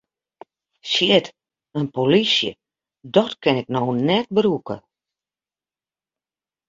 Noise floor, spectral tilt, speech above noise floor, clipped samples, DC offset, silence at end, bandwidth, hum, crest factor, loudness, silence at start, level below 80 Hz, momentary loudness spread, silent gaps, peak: under -90 dBFS; -5.5 dB/octave; over 71 dB; under 0.1%; under 0.1%; 1.9 s; 7.8 kHz; none; 20 dB; -20 LUFS; 0.85 s; -62 dBFS; 16 LU; none; -2 dBFS